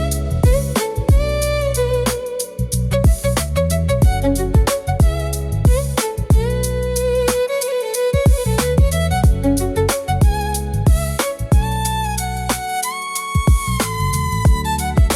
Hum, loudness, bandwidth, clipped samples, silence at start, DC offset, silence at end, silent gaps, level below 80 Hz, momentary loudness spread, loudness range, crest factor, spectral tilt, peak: none; -18 LUFS; 16 kHz; under 0.1%; 0 s; under 0.1%; 0 s; none; -20 dBFS; 5 LU; 2 LU; 12 dB; -5.5 dB/octave; -6 dBFS